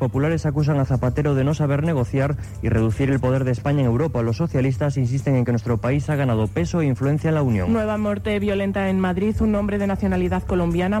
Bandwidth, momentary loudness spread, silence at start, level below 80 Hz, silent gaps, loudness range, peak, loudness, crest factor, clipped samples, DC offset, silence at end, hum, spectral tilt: 13 kHz; 2 LU; 0 s; -36 dBFS; none; 0 LU; -10 dBFS; -21 LUFS; 10 dB; under 0.1%; under 0.1%; 0 s; none; -8 dB/octave